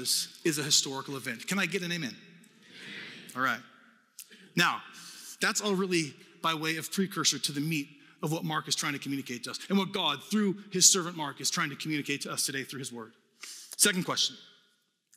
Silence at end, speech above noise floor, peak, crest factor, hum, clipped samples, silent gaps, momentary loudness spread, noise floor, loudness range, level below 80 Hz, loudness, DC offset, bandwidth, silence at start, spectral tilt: 0.7 s; 41 dB; -6 dBFS; 26 dB; none; under 0.1%; none; 18 LU; -72 dBFS; 7 LU; -84 dBFS; -29 LUFS; under 0.1%; 19 kHz; 0 s; -2.5 dB/octave